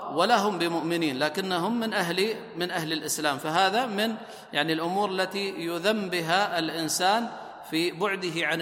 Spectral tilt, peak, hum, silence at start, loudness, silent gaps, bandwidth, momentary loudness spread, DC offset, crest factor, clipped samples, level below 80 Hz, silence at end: -3.5 dB/octave; -8 dBFS; none; 0 s; -27 LUFS; none; 16.5 kHz; 7 LU; under 0.1%; 20 dB; under 0.1%; -72 dBFS; 0 s